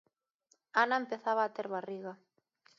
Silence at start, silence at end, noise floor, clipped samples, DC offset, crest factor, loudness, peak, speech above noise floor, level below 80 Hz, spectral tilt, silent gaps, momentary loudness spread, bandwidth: 0.75 s; 0.65 s; -75 dBFS; under 0.1%; under 0.1%; 22 dB; -34 LUFS; -14 dBFS; 41 dB; under -90 dBFS; -1.5 dB/octave; none; 14 LU; 7.4 kHz